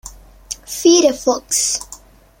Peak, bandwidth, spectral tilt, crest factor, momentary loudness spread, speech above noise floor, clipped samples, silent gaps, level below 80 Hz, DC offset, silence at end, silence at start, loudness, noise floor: -2 dBFS; 16.5 kHz; -1.5 dB/octave; 16 dB; 19 LU; 27 dB; under 0.1%; none; -46 dBFS; under 0.1%; 0.45 s; 0.05 s; -15 LUFS; -42 dBFS